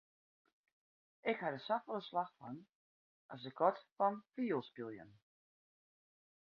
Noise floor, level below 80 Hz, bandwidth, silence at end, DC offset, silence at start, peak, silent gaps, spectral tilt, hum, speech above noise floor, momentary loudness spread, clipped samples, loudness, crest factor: under -90 dBFS; -88 dBFS; 6.4 kHz; 1.35 s; under 0.1%; 1.25 s; -20 dBFS; 2.75-3.29 s, 3.92-3.96 s; -4 dB/octave; none; over 50 dB; 16 LU; under 0.1%; -40 LUFS; 24 dB